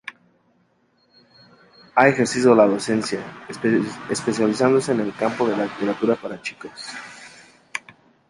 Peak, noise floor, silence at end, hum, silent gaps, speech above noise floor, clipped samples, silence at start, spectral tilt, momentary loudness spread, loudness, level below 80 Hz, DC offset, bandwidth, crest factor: -2 dBFS; -63 dBFS; 0.5 s; none; none; 43 dB; under 0.1%; 0.05 s; -5 dB/octave; 18 LU; -20 LUFS; -62 dBFS; under 0.1%; 11.5 kHz; 20 dB